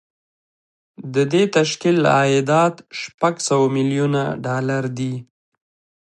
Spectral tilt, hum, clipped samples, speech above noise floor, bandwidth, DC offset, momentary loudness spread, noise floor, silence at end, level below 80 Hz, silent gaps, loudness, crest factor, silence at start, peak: -5.5 dB/octave; none; under 0.1%; over 72 dB; 11.5 kHz; under 0.1%; 11 LU; under -90 dBFS; 0.9 s; -64 dBFS; 3.14-3.18 s; -19 LUFS; 16 dB; 1 s; -2 dBFS